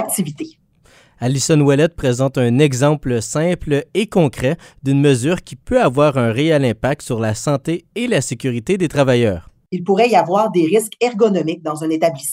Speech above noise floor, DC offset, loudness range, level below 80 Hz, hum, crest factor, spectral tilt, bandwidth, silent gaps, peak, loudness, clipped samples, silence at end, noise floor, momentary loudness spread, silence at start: 35 dB; under 0.1%; 2 LU; -44 dBFS; none; 16 dB; -5.5 dB/octave; 16 kHz; none; 0 dBFS; -17 LUFS; under 0.1%; 0 s; -51 dBFS; 8 LU; 0 s